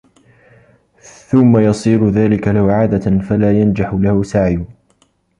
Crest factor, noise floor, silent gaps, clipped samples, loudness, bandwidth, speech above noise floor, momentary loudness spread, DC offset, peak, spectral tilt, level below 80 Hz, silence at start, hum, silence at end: 14 dB; -57 dBFS; none; under 0.1%; -14 LUFS; 10.5 kHz; 45 dB; 5 LU; under 0.1%; -2 dBFS; -8.5 dB/octave; -36 dBFS; 1.3 s; none; 0.75 s